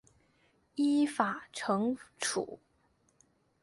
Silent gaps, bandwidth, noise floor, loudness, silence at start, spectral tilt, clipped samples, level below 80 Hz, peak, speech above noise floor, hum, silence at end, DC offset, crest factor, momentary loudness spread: none; 11.5 kHz; -72 dBFS; -33 LUFS; 0.75 s; -4 dB/octave; under 0.1%; -76 dBFS; -14 dBFS; 40 dB; none; 1.05 s; under 0.1%; 22 dB; 14 LU